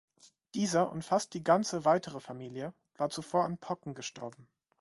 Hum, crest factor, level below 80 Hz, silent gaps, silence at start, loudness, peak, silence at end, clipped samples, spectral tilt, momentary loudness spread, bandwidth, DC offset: none; 22 dB; -70 dBFS; none; 0.55 s; -33 LUFS; -12 dBFS; 0.35 s; under 0.1%; -5 dB/octave; 15 LU; 11.5 kHz; under 0.1%